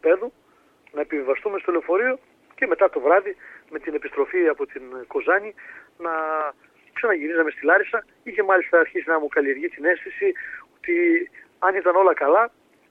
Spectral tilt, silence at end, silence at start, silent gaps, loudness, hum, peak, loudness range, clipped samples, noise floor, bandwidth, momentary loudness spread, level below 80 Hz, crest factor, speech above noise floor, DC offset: -6.5 dB/octave; 0.4 s; 0.05 s; none; -22 LUFS; none; -4 dBFS; 4 LU; under 0.1%; -57 dBFS; 4 kHz; 16 LU; -68 dBFS; 18 dB; 35 dB; under 0.1%